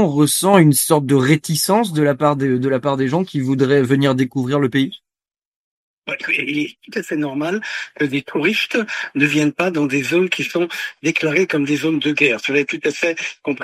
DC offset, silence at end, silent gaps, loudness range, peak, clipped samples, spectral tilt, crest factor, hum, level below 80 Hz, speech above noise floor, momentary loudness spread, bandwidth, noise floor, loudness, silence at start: under 0.1%; 0 s; 5.45-6.02 s; 6 LU; 0 dBFS; under 0.1%; -5 dB/octave; 18 dB; none; -62 dBFS; over 73 dB; 8 LU; 14.5 kHz; under -90 dBFS; -17 LUFS; 0 s